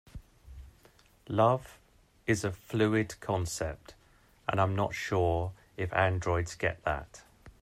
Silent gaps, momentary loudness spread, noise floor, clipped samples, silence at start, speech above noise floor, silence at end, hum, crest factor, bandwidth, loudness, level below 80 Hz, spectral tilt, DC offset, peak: none; 11 LU; -63 dBFS; under 0.1%; 0.15 s; 32 dB; 0.1 s; none; 20 dB; 15.5 kHz; -31 LUFS; -52 dBFS; -6 dB/octave; under 0.1%; -12 dBFS